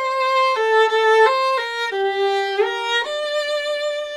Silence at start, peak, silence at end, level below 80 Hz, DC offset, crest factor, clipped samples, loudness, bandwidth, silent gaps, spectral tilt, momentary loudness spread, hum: 0 s; -4 dBFS; 0 s; -66 dBFS; under 0.1%; 16 dB; under 0.1%; -18 LUFS; 13 kHz; none; 0 dB/octave; 8 LU; none